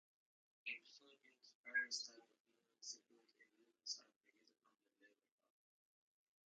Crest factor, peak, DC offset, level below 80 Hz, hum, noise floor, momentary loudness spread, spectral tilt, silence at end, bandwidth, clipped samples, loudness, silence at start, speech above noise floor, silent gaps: 24 dB; -32 dBFS; under 0.1%; under -90 dBFS; none; -78 dBFS; 24 LU; 4.5 dB/octave; 1.4 s; 7.4 kHz; under 0.1%; -49 LUFS; 0.65 s; 28 dB; 1.55-1.64 s, 2.40-2.45 s, 4.16-4.21 s